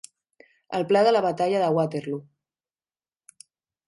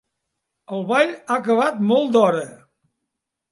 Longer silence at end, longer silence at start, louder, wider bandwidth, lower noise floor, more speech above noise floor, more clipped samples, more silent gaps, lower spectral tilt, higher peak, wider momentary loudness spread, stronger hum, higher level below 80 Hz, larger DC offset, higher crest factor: first, 1.65 s vs 0.95 s; about the same, 0.7 s vs 0.7 s; second, -23 LUFS vs -19 LUFS; about the same, 11.5 kHz vs 11.5 kHz; first, under -90 dBFS vs -81 dBFS; first, over 68 dB vs 62 dB; neither; neither; about the same, -6 dB/octave vs -5.5 dB/octave; second, -8 dBFS vs -4 dBFS; about the same, 13 LU vs 12 LU; neither; about the same, -74 dBFS vs -74 dBFS; neither; about the same, 18 dB vs 18 dB